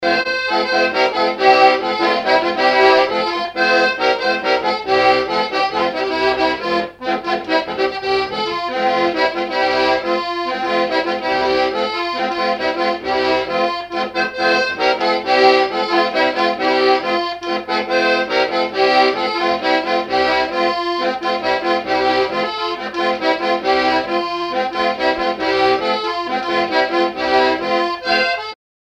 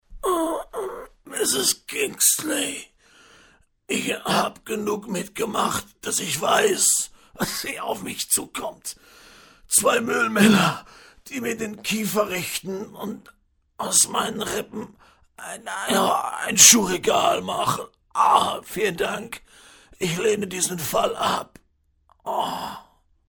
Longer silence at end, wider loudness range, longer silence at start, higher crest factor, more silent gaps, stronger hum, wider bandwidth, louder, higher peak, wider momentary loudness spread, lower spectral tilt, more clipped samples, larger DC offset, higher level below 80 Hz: second, 0.3 s vs 0.5 s; second, 4 LU vs 8 LU; about the same, 0 s vs 0.1 s; second, 16 dB vs 22 dB; neither; neither; second, 9.6 kHz vs 19 kHz; first, -17 LUFS vs -21 LUFS; about the same, 0 dBFS vs -2 dBFS; second, 7 LU vs 17 LU; first, -4 dB/octave vs -2 dB/octave; neither; neither; about the same, -52 dBFS vs -56 dBFS